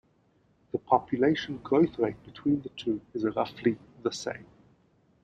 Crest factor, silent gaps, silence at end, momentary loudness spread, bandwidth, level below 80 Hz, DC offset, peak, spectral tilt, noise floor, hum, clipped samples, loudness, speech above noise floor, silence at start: 22 dB; none; 0.8 s; 11 LU; 9 kHz; -64 dBFS; under 0.1%; -8 dBFS; -6 dB/octave; -67 dBFS; none; under 0.1%; -29 LUFS; 38 dB; 0.75 s